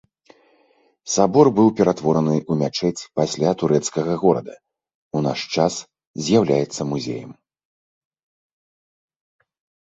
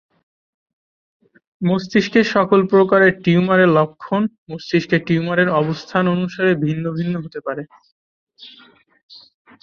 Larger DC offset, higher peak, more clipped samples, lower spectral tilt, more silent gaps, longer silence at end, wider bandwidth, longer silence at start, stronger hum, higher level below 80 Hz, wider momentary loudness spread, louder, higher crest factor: neither; about the same, -2 dBFS vs -2 dBFS; neither; second, -5.5 dB/octave vs -7.5 dB/octave; second, 4.95-5.11 s, 6.07-6.14 s vs 4.38-4.46 s, 7.92-8.27 s; first, 2.6 s vs 1.15 s; first, 8.2 kHz vs 7 kHz; second, 1.05 s vs 1.6 s; neither; about the same, -58 dBFS vs -58 dBFS; first, 14 LU vs 11 LU; second, -20 LUFS vs -17 LUFS; about the same, 20 dB vs 18 dB